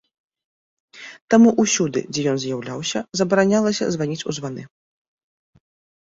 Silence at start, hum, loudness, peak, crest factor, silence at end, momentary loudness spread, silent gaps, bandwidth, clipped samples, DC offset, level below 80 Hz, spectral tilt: 0.95 s; none; -20 LUFS; -2 dBFS; 20 dB; 1.35 s; 18 LU; 1.21-1.28 s; 7.8 kHz; under 0.1%; under 0.1%; -62 dBFS; -4.5 dB/octave